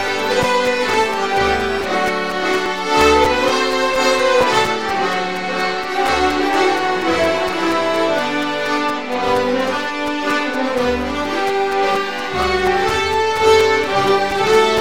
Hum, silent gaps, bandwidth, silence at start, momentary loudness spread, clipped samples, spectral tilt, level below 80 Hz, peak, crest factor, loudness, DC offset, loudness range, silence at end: none; none; 17 kHz; 0 s; 6 LU; under 0.1%; -3.5 dB/octave; -40 dBFS; -2 dBFS; 14 dB; -16 LUFS; 1%; 3 LU; 0 s